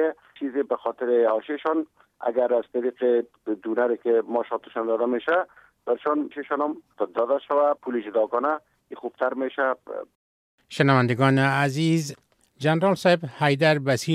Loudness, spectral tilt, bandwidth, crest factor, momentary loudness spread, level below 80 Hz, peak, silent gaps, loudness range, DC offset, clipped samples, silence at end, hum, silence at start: -24 LUFS; -6.5 dB/octave; 14.5 kHz; 18 dB; 11 LU; -72 dBFS; -4 dBFS; 10.15-10.58 s; 4 LU; under 0.1%; under 0.1%; 0 s; none; 0 s